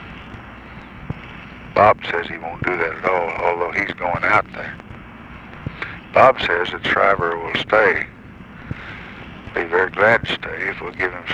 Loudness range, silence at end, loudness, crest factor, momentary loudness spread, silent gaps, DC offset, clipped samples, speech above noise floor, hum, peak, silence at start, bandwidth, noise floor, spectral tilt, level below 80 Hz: 4 LU; 0 s; -18 LUFS; 20 dB; 22 LU; none; under 0.1%; under 0.1%; 20 dB; none; 0 dBFS; 0 s; 10 kHz; -39 dBFS; -6 dB/octave; -44 dBFS